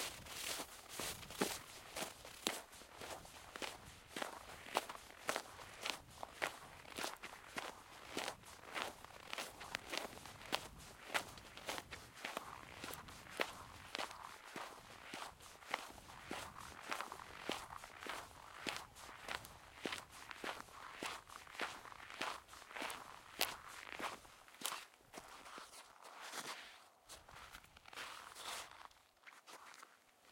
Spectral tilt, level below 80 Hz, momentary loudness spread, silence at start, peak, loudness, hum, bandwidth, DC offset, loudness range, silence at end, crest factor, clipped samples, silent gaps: -1.5 dB/octave; -72 dBFS; 13 LU; 0 s; -12 dBFS; -48 LUFS; none; 16.5 kHz; under 0.1%; 5 LU; 0 s; 38 dB; under 0.1%; none